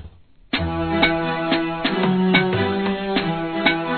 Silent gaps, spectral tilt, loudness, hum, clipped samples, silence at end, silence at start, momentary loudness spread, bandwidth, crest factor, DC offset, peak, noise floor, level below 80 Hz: none; -9 dB/octave; -20 LUFS; none; under 0.1%; 0 s; 0 s; 6 LU; 4.6 kHz; 20 dB; 0.2%; -2 dBFS; -45 dBFS; -42 dBFS